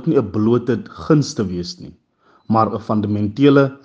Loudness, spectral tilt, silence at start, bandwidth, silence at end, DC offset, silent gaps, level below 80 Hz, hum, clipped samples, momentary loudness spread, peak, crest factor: -18 LUFS; -7.5 dB/octave; 0 s; 8 kHz; 0.1 s; under 0.1%; none; -54 dBFS; none; under 0.1%; 11 LU; 0 dBFS; 18 dB